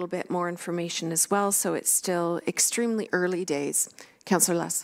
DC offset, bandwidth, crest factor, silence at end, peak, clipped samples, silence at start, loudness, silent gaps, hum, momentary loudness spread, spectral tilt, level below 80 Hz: under 0.1%; 16 kHz; 20 dB; 0 s; -8 dBFS; under 0.1%; 0 s; -25 LUFS; none; none; 7 LU; -3 dB/octave; -76 dBFS